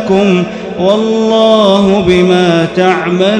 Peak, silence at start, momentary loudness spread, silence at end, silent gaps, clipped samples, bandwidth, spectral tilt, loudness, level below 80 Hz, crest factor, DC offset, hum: 0 dBFS; 0 s; 5 LU; 0 s; none; 0.8%; 9.8 kHz; -6 dB/octave; -9 LUFS; -40 dBFS; 8 dB; under 0.1%; none